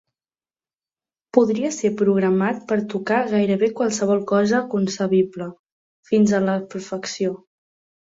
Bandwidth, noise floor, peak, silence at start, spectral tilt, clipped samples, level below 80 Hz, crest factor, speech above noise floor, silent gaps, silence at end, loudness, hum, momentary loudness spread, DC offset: 7.8 kHz; under -90 dBFS; -2 dBFS; 1.35 s; -6 dB/octave; under 0.1%; -64 dBFS; 20 dB; over 70 dB; 5.59-5.64 s, 5.72-6.03 s; 0.65 s; -21 LUFS; none; 8 LU; under 0.1%